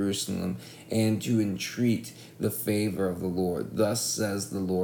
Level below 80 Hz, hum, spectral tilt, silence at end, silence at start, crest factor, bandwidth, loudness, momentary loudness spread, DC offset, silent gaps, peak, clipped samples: -62 dBFS; none; -5 dB/octave; 0 s; 0 s; 16 dB; 19.5 kHz; -29 LUFS; 6 LU; under 0.1%; none; -12 dBFS; under 0.1%